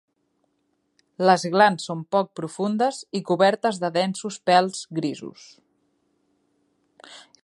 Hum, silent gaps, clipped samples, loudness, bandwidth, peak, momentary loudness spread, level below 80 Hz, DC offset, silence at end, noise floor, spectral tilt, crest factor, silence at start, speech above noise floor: none; none; under 0.1%; -22 LUFS; 11.5 kHz; -2 dBFS; 11 LU; -76 dBFS; under 0.1%; 0.25 s; -72 dBFS; -5 dB/octave; 22 dB; 1.2 s; 49 dB